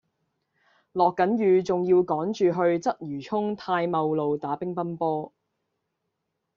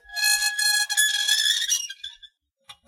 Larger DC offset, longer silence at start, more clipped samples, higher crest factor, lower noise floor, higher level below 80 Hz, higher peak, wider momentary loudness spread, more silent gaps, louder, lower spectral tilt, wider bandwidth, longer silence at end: neither; first, 0.95 s vs 0.1 s; neither; about the same, 18 dB vs 18 dB; first, -80 dBFS vs -53 dBFS; about the same, -68 dBFS vs -66 dBFS; about the same, -8 dBFS vs -8 dBFS; second, 8 LU vs 14 LU; neither; second, -25 LUFS vs -20 LUFS; first, -6 dB/octave vs 7 dB/octave; second, 7.2 kHz vs 16 kHz; first, 1.3 s vs 0.15 s